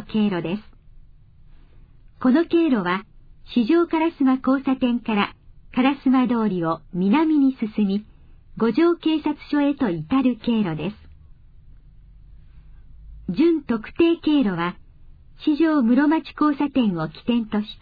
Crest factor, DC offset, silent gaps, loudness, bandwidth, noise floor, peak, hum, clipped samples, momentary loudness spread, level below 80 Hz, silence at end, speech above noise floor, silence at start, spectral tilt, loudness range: 16 dB; under 0.1%; none; -21 LUFS; 5 kHz; -47 dBFS; -6 dBFS; none; under 0.1%; 9 LU; -48 dBFS; 0.05 s; 27 dB; 0 s; -9.5 dB/octave; 5 LU